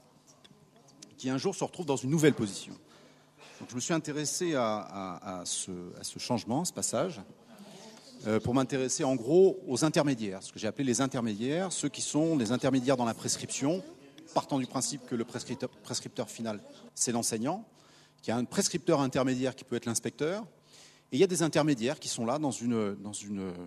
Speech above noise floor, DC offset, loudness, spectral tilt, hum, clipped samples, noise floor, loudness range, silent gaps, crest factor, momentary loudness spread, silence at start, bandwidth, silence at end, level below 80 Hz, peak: 29 dB; under 0.1%; -31 LUFS; -4.5 dB/octave; none; under 0.1%; -60 dBFS; 6 LU; none; 22 dB; 12 LU; 1 s; 13.5 kHz; 0 s; -70 dBFS; -10 dBFS